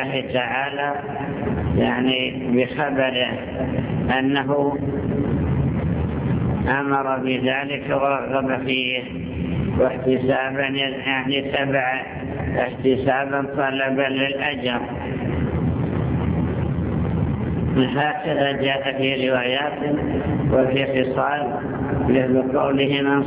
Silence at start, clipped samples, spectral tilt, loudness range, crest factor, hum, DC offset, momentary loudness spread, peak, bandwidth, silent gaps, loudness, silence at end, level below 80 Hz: 0 s; under 0.1%; -10.5 dB/octave; 2 LU; 16 dB; none; under 0.1%; 5 LU; -4 dBFS; 4 kHz; none; -21 LUFS; 0 s; -36 dBFS